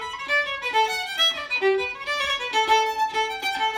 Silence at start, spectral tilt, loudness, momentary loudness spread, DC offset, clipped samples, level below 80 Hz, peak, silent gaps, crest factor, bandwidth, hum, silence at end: 0 s; -0.5 dB/octave; -22 LUFS; 5 LU; under 0.1%; under 0.1%; -58 dBFS; -6 dBFS; none; 16 dB; 16.5 kHz; none; 0 s